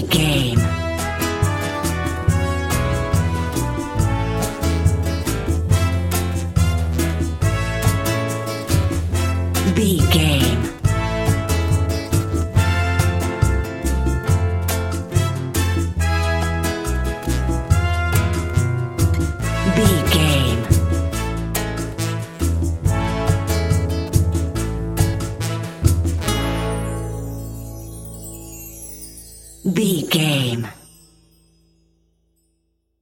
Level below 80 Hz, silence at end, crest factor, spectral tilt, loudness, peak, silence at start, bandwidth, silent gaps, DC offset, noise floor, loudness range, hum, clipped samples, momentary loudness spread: -28 dBFS; 2.25 s; 18 dB; -5.5 dB/octave; -20 LUFS; 0 dBFS; 0 s; 17 kHz; none; under 0.1%; -68 dBFS; 5 LU; none; under 0.1%; 8 LU